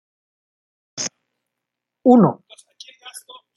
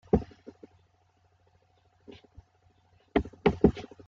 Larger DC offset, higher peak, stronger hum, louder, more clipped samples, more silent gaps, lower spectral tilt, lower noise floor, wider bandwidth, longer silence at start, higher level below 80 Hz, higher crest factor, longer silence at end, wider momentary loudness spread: neither; first, -2 dBFS vs -6 dBFS; neither; first, -17 LUFS vs -28 LUFS; neither; neither; second, -6 dB/octave vs -8.5 dB/octave; first, -82 dBFS vs -67 dBFS; first, 12 kHz vs 7.2 kHz; first, 0.95 s vs 0.15 s; second, -68 dBFS vs -46 dBFS; second, 20 dB vs 26 dB; first, 0.4 s vs 0.25 s; about the same, 25 LU vs 27 LU